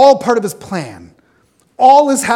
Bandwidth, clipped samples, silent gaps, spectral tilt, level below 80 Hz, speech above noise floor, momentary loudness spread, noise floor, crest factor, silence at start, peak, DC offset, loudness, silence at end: 17 kHz; 0.8%; none; -4 dB/octave; -58 dBFS; 43 dB; 15 LU; -55 dBFS; 12 dB; 0 s; 0 dBFS; under 0.1%; -12 LUFS; 0 s